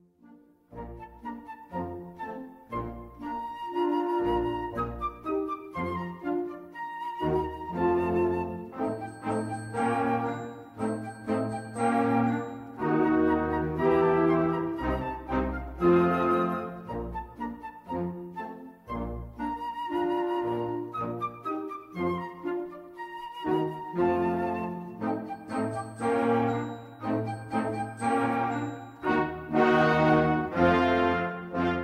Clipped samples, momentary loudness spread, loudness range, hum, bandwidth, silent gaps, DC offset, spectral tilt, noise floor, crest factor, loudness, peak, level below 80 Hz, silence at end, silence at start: under 0.1%; 15 LU; 7 LU; none; 12 kHz; none; under 0.1%; -7.5 dB/octave; -56 dBFS; 18 dB; -29 LUFS; -10 dBFS; -50 dBFS; 0 s; 0.3 s